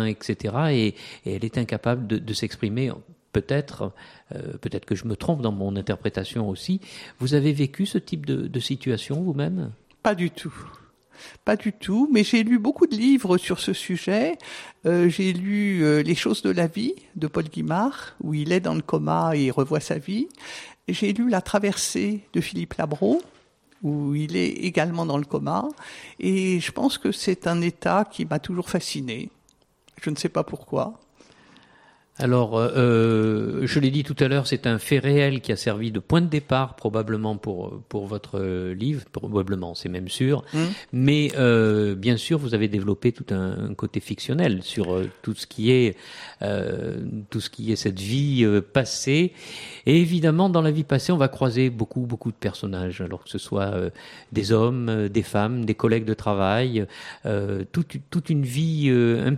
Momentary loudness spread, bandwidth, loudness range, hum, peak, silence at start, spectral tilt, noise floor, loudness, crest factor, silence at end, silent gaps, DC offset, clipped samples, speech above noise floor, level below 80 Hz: 11 LU; 15 kHz; 6 LU; none; -6 dBFS; 0 s; -6 dB/octave; -62 dBFS; -24 LUFS; 18 dB; 0 s; none; under 0.1%; under 0.1%; 39 dB; -56 dBFS